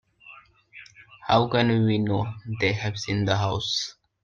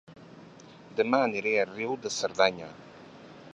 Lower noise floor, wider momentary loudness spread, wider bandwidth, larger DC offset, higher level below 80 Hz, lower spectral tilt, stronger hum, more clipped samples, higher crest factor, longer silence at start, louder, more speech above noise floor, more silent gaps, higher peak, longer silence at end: about the same, -50 dBFS vs -50 dBFS; second, 13 LU vs 23 LU; second, 7.4 kHz vs 11.5 kHz; neither; first, -54 dBFS vs -72 dBFS; first, -5.5 dB/octave vs -3.5 dB/octave; neither; neither; second, 18 dB vs 24 dB; first, 0.25 s vs 0.1 s; first, -24 LUFS vs -28 LUFS; first, 27 dB vs 23 dB; neither; about the same, -8 dBFS vs -8 dBFS; first, 0.3 s vs 0.05 s